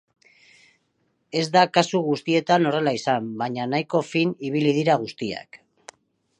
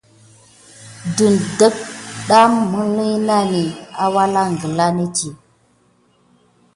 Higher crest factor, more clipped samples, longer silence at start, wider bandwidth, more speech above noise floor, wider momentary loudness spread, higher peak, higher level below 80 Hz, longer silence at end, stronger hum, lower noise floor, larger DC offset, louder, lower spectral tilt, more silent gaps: about the same, 22 dB vs 18 dB; neither; first, 1.35 s vs 0.8 s; about the same, 10.5 kHz vs 11.5 kHz; first, 48 dB vs 41 dB; second, 10 LU vs 14 LU; about the same, -2 dBFS vs 0 dBFS; second, -70 dBFS vs -56 dBFS; second, 0.85 s vs 1.4 s; neither; first, -70 dBFS vs -57 dBFS; neither; second, -22 LUFS vs -16 LUFS; about the same, -5.5 dB/octave vs -5 dB/octave; neither